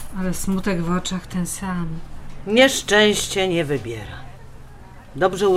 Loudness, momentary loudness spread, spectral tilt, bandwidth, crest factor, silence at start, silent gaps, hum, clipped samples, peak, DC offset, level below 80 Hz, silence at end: -20 LUFS; 20 LU; -4 dB/octave; 16 kHz; 18 dB; 0 s; none; none; under 0.1%; -2 dBFS; under 0.1%; -36 dBFS; 0 s